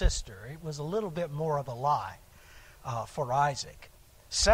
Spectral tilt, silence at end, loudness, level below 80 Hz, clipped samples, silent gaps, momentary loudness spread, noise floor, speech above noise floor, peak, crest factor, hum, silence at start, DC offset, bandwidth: -3.5 dB/octave; 0 s; -32 LUFS; -40 dBFS; under 0.1%; none; 18 LU; -53 dBFS; 22 dB; -10 dBFS; 22 dB; none; 0 s; under 0.1%; 16 kHz